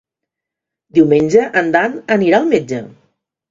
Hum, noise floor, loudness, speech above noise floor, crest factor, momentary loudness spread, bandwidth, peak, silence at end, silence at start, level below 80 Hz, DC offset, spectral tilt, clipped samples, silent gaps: none; -83 dBFS; -13 LUFS; 70 dB; 16 dB; 6 LU; 7.6 kHz; 0 dBFS; 0.6 s; 0.95 s; -56 dBFS; under 0.1%; -6.5 dB/octave; under 0.1%; none